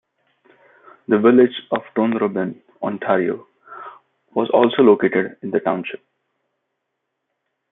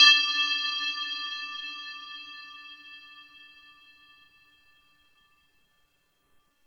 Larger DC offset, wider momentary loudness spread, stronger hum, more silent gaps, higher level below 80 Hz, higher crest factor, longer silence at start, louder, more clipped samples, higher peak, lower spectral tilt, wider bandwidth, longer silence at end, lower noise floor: neither; about the same, 23 LU vs 25 LU; neither; neither; first, -68 dBFS vs -80 dBFS; second, 18 dB vs 24 dB; first, 1.1 s vs 0 s; first, -18 LUFS vs -26 LUFS; neither; first, -2 dBFS vs -6 dBFS; first, -10.5 dB/octave vs 4 dB/octave; second, 3.9 kHz vs 17 kHz; second, 1.75 s vs 3.45 s; first, -77 dBFS vs -70 dBFS